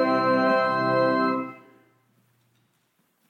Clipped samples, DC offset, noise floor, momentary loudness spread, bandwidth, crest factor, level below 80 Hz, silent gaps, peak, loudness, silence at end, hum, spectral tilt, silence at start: under 0.1%; under 0.1%; -70 dBFS; 8 LU; 8.8 kHz; 14 dB; -78 dBFS; none; -10 dBFS; -22 LUFS; 1.75 s; none; -7 dB/octave; 0 s